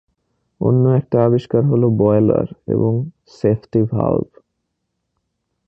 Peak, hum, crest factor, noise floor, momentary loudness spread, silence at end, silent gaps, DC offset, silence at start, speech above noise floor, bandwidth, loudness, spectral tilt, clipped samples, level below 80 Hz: -2 dBFS; none; 16 dB; -74 dBFS; 8 LU; 1.45 s; none; under 0.1%; 0.6 s; 58 dB; 6 kHz; -17 LUFS; -11 dB/octave; under 0.1%; -48 dBFS